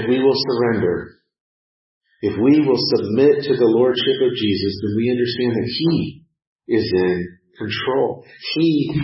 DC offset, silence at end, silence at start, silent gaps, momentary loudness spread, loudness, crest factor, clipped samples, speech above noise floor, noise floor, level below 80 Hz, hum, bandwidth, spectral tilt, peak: under 0.1%; 0 s; 0 s; 1.40-2.01 s, 6.47-6.56 s; 10 LU; -18 LUFS; 14 dB; under 0.1%; over 72 dB; under -90 dBFS; -54 dBFS; none; 5.8 kHz; -9.5 dB/octave; -4 dBFS